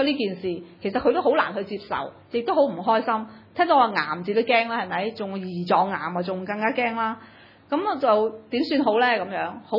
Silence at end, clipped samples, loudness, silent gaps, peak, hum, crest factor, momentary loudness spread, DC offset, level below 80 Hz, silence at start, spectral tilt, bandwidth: 0 s; under 0.1%; -24 LUFS; none; -6 dBFS; none; 18 dB; 10 LU; under 0.1%; -64 dBFS; 0 s; -7.5 dB/octave; 5.8 kHz